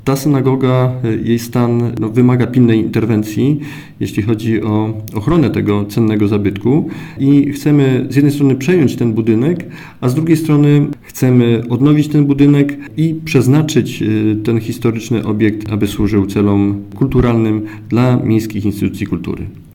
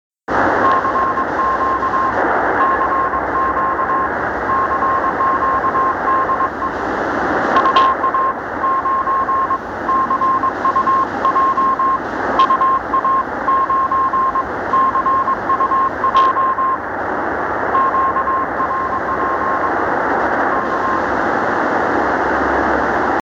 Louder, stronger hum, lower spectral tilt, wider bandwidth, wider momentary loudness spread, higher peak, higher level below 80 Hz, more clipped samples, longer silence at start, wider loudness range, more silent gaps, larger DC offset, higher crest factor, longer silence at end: about the same, -14 LUFS vs -16 LUFS; neither; first, -7.5 dB/octave vs -6 dB/octave; first, 17.5 kHz vs 7.6 kHz; about the same, 7 LU vs 5 LU; about the same, 0 dBFS vs 0 dBFS; about the same, -38 dBFS vs -42 dBFS; neither; second, 0.05 s vs 0.3 s; about the same, 3 LU vs 2 LU; neither; neither; about the same, 12 dB vs 16 dB; about the same, 0.1 s vs 0 s